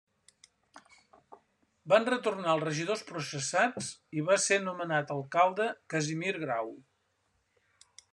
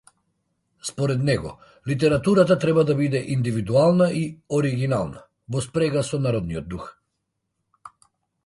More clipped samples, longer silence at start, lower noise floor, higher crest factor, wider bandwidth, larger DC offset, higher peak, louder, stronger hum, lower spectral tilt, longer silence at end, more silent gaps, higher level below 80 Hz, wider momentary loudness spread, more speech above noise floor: neither; about the same, 0.75 s vs 0.85 s; about the same, -76 dBFS vs -78 dBFS; first, 24 dB vs 18 dB; about the same, 12 kHz vs 11.5 kHz; neither; second, -8 dBFS vs -4 dBFS; second, -30 LUFS vs -22 LUFS; neither; second, -3.5 dB/octave vs -6.5 dB/octave; first, 1.3 s vs 0.55 s; neither; second, -80 dBFS vs -50 dBFS; second, 10 LU vs 15 LU; second, 45 dB vs 56 dB